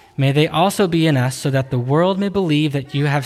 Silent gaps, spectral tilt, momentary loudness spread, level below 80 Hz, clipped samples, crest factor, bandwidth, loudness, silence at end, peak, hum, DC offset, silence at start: none; -6 dB/octave; 4 LU; -50 dBFS; under 0.1%; 14 dB; 14.5 kHz; -17 LUFS; 0 s; -4 dBFS; none; under 0.1%; 0.2 s